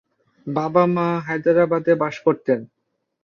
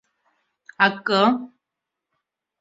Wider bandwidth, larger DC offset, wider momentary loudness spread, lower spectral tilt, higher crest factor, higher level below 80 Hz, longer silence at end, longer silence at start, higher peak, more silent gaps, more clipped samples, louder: second, 6.8 kHz vs 7.8 kHz; neither; second, 7 LU vs 11 LU; first, -8.5 dB/octave vs -5.5 dB/octave; second, 18 dB vs 24 dB; first, -64 dBFS vs -72 dBFS; second, 0.6 s vs 1.15 s; second, 0.45 s vs 0.8 s; about the same, -2 dBFS vs -2 dBFS; neither; neither; about the same, -20 LUFS vs -20 LUFS